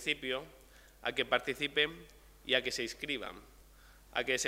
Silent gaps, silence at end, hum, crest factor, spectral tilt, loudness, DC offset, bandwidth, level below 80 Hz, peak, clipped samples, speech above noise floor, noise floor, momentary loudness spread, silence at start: none; 0 s; none; 24 dB; -2 dB/octave; -34 LUFS; under 0.1%; 16 kHz; -62 dBFS; -12 dBFS; under 0.1%; 24 dB; -59 dBFS; 17 LU; 0 s